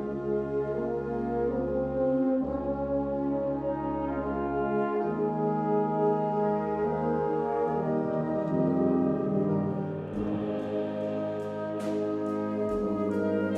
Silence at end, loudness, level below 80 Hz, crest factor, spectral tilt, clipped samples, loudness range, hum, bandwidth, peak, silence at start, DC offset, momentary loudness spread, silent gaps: 0 s; -29 LUFS; -52 dBFS; 16 dB; -9.5 dB/octave; under 0.1%; 3 LU; none; 9 kHz; -14 dBFS; 0 s; under 0.1%; 5 LU; none